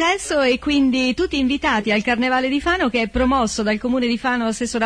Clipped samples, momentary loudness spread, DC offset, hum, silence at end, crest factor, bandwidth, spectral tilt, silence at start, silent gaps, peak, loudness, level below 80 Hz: under 0.1%; 3 LU; under 0.1%; none; 0 s; 12 dB; 11 kHz; -4 dB/octave; 0 s; none; -6 dBFS; -19 LUFS; -38 dBFS